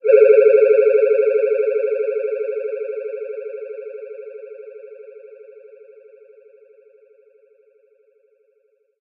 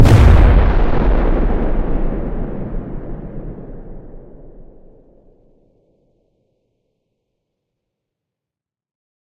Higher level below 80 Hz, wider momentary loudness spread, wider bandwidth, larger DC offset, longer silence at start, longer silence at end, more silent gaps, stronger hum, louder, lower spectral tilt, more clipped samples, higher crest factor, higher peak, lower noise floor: second, under -90 dBFS vs -18 dBFS; about the same, 26 LU vs 25 LU; second, 2.9 kHz vs 10.5 kHz; neither; about the same, 0.05 s vs 0 s; second, 3.9 s vs 4.6 s; neither; neither; about the same, -17 LUFS vs -16 LUFS; about the same, -7 dB/octave vs -8 dB/octave; neither; about the same, 18 dB vs 16 dB; about the same, 0 dBFS vs 0 dBFS; second, -64 dBFS vs -87 dBFS